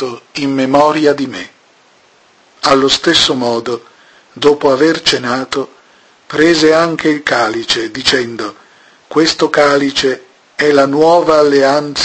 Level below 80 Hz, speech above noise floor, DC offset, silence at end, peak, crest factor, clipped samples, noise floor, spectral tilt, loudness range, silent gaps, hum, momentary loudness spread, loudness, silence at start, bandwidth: -48 dBFS; 37 dB; under 0.1%; 0 s; 0 dBFS; 12 dB; 0.1%; -48 dBFS; -3.5 dB/octave; 2 LU; none; none; 12 LU; -12 LUFS; 0 s; 11 kHz